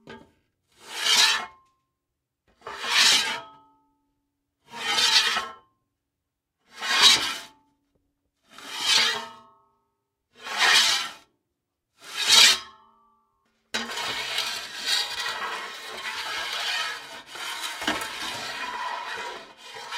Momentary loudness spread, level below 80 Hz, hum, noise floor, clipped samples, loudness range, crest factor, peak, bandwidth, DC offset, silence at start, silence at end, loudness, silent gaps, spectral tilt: 20 LU; -68 dBFS; none; -83 dBFS; under 0.1%; 9 LU; 26 dB; -2 dBFS; 16 kHz; under 0.1%; 0.05 s; 0 s; -22 LUFS; none; 1.5 dB/octave